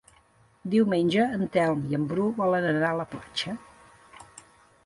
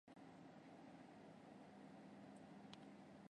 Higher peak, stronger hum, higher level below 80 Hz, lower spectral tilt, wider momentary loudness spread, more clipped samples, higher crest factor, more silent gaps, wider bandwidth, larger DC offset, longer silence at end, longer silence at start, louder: first, -12 dBFS vs -38 dBFS; neither; first, -62 dBFS vs -90 dBFS; about the same, -6.5 dB/octave vs -6 dB/octave; first, 15 LU vs 2 LU; neither; second, 16 dB vs 24 dB; neither; about the same, 11.5 kHz vs 10.5 kHz; neither; first, 0.45 s vs 0.05 s; first, 0.65 s vs 0.05 s; first, -26 LUFS vs -62 LUFS